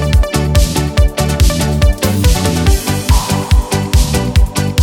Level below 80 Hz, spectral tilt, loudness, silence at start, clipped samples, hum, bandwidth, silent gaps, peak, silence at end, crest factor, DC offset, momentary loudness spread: -14 dBFS; -5 dB/octave; -13 LUFS; 0 s; under 0.1%; none; 17.5 kHz; none; 0 dBFS; 0 s; 12 dB; under 0.1%; 2 LU